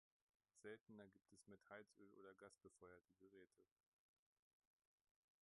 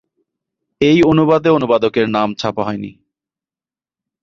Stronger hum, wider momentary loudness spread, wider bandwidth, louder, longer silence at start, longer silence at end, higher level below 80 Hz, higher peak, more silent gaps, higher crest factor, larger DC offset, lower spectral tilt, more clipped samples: neither; second, 7 LU vs 11 LU; first, 11 kHz vs 7.4 kHz; second, -66 LUFS vs -14 LUFS; second, 0.55 s vs 0.8 s; first, 1.75 s vs 1.3 s; second, under -90 dBFS vs -48 dBFS; second, -46 dBFS vs -2 dBFS; first, 0.81-0.86 s vs none; first, 22 dB vs 16 dB; neither; second, -4.5 dB/octave vs -7 dB/octave; neither